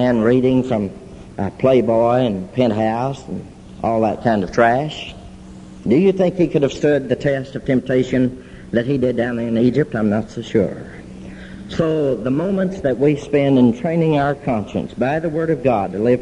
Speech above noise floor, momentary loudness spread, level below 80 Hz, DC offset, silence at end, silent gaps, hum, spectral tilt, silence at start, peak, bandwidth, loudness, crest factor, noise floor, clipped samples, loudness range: 20 dB; 17 LU; -44 dBFS; under 0.1%; 0 s; none; none; -7.5 dB/octave; 0 s; 0 dBFS; 10 kHz; -18 LUFS; 18 dB; -37 dBFS; under 0.1%; 3 LU